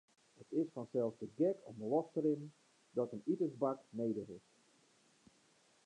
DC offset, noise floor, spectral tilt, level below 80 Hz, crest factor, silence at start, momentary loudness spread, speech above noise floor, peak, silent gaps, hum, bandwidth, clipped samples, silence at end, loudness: under 0.1%; -72 dBFS; -9 dB/octave; -86 dBFS; 18 dB; 0.4 s; 8 LU; 33 dB; -22 dBFS; none; none; 10 kHz; under 0.1%; 1.45 s; -40 LUFS